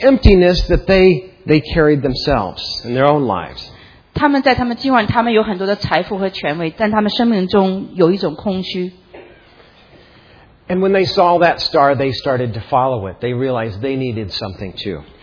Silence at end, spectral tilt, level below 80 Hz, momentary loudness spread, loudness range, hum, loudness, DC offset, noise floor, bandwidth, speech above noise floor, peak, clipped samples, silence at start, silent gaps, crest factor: 0.2 s; -7 dB/octave; -28 dBFS; 11 LU; 5 LU; none; -15 LUFS; under 0.1%; -46 dBFS; 5.4 kHz; 31 dB; 0 dBFS; under 0.1%; 0 s; none; 16 dB